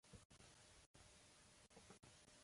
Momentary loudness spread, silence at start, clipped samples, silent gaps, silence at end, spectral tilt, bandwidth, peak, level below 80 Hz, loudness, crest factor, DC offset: 2 LU; 0.05 s; under 0.1%; 0.25-0.30 s, 0.86-0.94 s; 0 s; -3 dB/octave; 11.5 kHz; -50 dBFS; -78 dBFS; -67 LUFS; 18 dB; under 0.1%